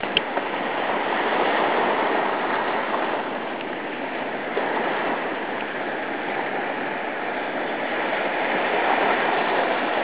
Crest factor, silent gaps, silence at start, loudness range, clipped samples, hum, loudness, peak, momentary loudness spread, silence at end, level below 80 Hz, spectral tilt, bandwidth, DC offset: 22 dB; none; 0 s; 3 LU; under 0.1%; none; -24 LUFS; -2 dBFS; 7 LU; 0 s; -62 dBFS; -7.5 dB/octave; 4 kHz; 0.4%